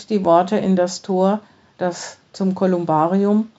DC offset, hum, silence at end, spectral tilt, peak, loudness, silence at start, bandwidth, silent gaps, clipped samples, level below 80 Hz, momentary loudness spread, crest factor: under 0.1%; none; 0.1 s; -7 dB/octave; -2 dBFS; -19 LUFS; 0 s; 8 kHz; none; under 0.1%; -66 dBFS; 10 LU; 18 dB